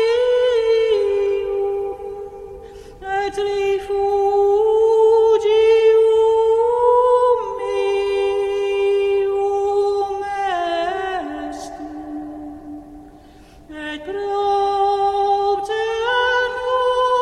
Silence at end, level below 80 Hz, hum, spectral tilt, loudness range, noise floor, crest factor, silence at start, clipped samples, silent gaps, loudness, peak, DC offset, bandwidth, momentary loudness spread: 0 s; -48 dBFS; none; -4 dB/octave; 11 LU; -44 dBFS; 14 dB; 0 s; under 0.1%; none; -18 LUFS; -4 dBFS; under 0.1%; 9.8 kHz; 17 LU